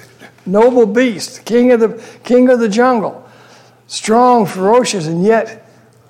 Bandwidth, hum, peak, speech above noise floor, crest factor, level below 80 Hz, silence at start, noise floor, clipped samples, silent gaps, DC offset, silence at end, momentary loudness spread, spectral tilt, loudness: 14 kHz; none; -2 dBFS; 32 dB; 12 dB; -56 dBFS; 0.25 s; -43 dBFS; under 0.1%; none; under 0.1%; 0.55 s; 14 LU; -5 dB/octave; -12 LUFS